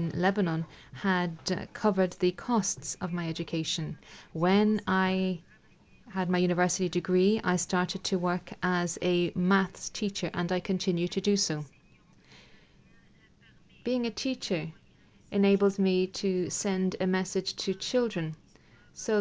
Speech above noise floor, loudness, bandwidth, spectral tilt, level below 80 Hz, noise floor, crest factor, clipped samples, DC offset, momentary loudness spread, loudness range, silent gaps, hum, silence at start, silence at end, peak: 31 dB; -29 LUFS; 8 kHz; -5 dB/octave; -62 dBFS; -60 dBFS; 18 dB; under 0.1%; under 0.1%; 9 LU; 6 LU; none; none; 0 s; 0 s; -12 dBFS